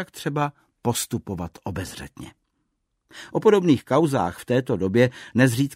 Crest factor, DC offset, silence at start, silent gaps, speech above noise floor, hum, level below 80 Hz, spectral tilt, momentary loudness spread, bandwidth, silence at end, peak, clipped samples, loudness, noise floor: 18 dB; under 0.1%; 0 s; none; 52 dB; none; -54 dBFS; -6 dB/octave; 15 LU; 16 kHz; 0 s; -4 dBFS; under 0.1%; -23 LUFS; -74 dBFS